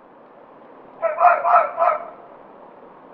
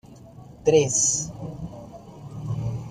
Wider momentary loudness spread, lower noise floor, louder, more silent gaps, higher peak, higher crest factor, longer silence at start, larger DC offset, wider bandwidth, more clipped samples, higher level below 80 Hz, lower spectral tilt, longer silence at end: second, 12 LU vs 22 LU; about the same, -46 dBFS vs -45 dBFS; first, -18 LUFS vs -22 LUFS; neither; first, 0 dBFS vs -6 dBFS; about the same, 22 dB vs 20 dB; first, 1 s vs 0.05 s; neither; second, 4.5 kHz vs 14 kHz; neither; second, -74 dBFS vs -50 dBFS; second, -1.5 dB/octave vs -4 dB/octave; first, 1 s vs 0 s